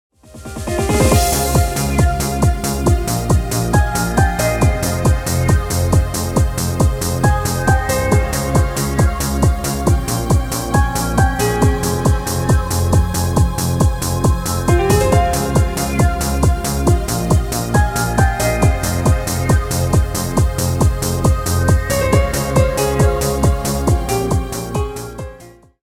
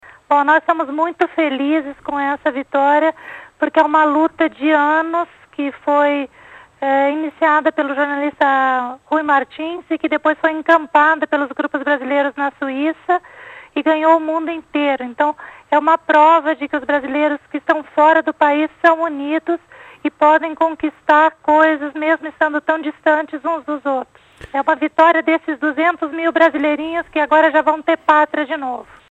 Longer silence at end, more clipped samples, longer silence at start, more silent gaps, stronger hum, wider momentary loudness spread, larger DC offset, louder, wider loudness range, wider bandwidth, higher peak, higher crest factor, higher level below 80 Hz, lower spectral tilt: about the same, 0.3 s vs 0.3 s; neither; about the same, 0.35 s vs 0.3 s; neither; neither; second, 3 LU vs 9 LU; neither; about the same, -16 LUFS vs -16 LUFS; about the same, 1 LU vs 3 LU; first, 17.5 kHz vs 8.2 kHz; about the same, 0 dBFS vs 0 dBFS; about the same, 14 dB vs 16 dB; first, -22 dBFS vs -60 dBFS; about the same, -5.5 dB/octave vs -4.5 dB/octave